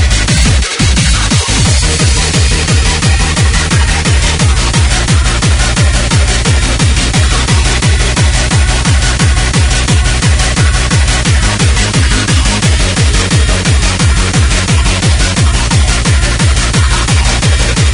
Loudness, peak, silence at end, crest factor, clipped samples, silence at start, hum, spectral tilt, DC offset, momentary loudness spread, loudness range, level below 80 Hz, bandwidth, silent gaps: -10 LUFS; 0 dBFS; 0 s; 8 dB; under 0.1%; 0 s; none; -3.5 dB/octave; under 0.1%; 1 LU; 0 LU; -12 dBFS; 11 kHz; none